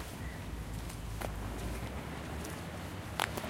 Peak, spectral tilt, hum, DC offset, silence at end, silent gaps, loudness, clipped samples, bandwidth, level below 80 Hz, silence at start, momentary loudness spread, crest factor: -10 dBFS; -4.5 dB/octave; none; under 0.1%; 0 s; none; -41 LUFS; under 0.1%; 16.5 kHz; -46 dBFS; 0 s; 5 LU; 30 dB